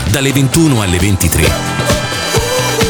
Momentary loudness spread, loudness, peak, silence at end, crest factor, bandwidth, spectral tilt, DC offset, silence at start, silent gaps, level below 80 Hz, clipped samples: 3 LU; -12 LUFS; 0 dBFS; 0 s; 12 dB; over 20 kHz; -4.5 dB/octave; under 0.1%; 0 s; none; -24 dBFS; under 0.1%